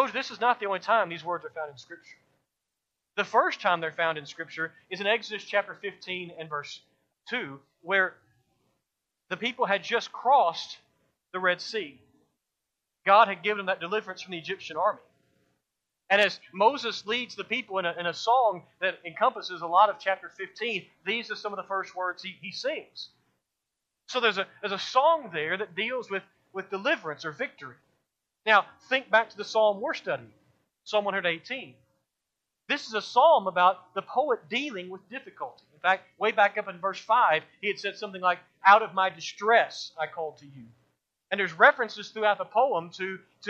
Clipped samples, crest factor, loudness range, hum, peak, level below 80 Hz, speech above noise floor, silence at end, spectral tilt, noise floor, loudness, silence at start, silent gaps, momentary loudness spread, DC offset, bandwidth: under 0.1%; 24 dB; 7 LU; none; -4 dBFS; -84 dBFS; 57 dB; 0 s; -3.5 dB/octave; -85 dBFS; -27 LUFS; 0 s; none; 15 LU; under 0.1%; 8.4 kHz